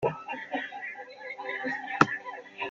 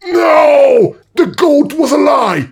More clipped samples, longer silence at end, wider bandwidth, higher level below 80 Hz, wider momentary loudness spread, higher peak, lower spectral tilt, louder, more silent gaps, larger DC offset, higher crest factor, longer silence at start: neither; about the same, 0 s vs 0.05 s; second, 8.6 kHz vs 16.5 kHz; second, -70 dBFS vs -54 dBFS; first, 15 LU vs 7 LU; about the same, 0 dBFS vs 0 dBFS; about the same, -5.5 dB/octave vs -5.5 dB/octave; second, -31 LUFS vs -9 LUFS; neither; neither; first, 32 dB vs 10 dB; about the same, 0 s vs 0.05 s